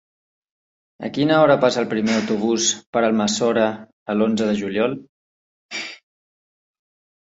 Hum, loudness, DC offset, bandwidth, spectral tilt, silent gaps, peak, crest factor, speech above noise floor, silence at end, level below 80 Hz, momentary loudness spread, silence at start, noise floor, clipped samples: none; -20 LUFS; under 0.1%; 8 kHz; -4 dB/octave; 2.86-2.93 s, 3.93-4.06 s, 5.09-5.69 s; -2 dBFS; 18 dB; over 71 dB; 1.25 s; -62 dBFS; 15 LU; 1 s; under -90 dBFS; under 0.1%